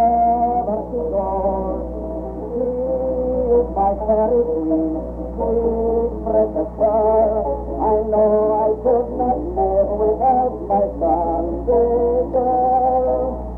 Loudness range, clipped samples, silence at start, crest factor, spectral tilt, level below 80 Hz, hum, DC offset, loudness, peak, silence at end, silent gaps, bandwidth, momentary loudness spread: 3 LU; under 0.1%; 0 s; 12 dB; -12 dB/octave; -32 dBFS; 60 Hz at -35 dBFS; under 0.1%; -19 LUFS; -6 dBFS; 0 s; none; 2.5 kHz; 7 LU